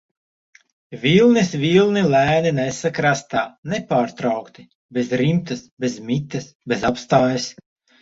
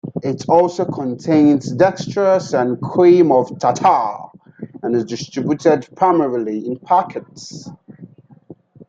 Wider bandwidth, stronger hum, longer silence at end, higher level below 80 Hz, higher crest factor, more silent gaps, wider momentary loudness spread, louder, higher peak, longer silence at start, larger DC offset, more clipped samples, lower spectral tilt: about the same, 8 kHz vs 7.8 kHz; neither; first, 0.5 s vs 0.05 s; first, -54 dBFS vs -60 dBFS; about the same, 18 dB vs 16 dB; first, 3.58-3.63 s, 4.75-4.89 s, 5.71-5.77 s, 6.55-6.60 s vs none; second, 12 LU vs 17 LU; second, -19 LUFS vs -16 LUFS; about the same, -2 dBFS vs -2 dBFS; first, 0.9 s vs 0.05 s; neither; neither; about the same, -5.5 dB/octave vs -6.5 dB/octave